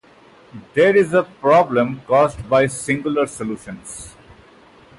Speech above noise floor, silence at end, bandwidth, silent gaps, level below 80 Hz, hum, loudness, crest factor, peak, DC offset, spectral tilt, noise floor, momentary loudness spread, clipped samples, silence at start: 31 dB; 0.9 s; 11.5 kHz; none; -50 dBFS; none; -17 LUFS; 14 dB; -4 dBFS; under 0.1%; -5.5 dB/octave; -48 dBFS; 18 LU; under 0.1%; 0.55 s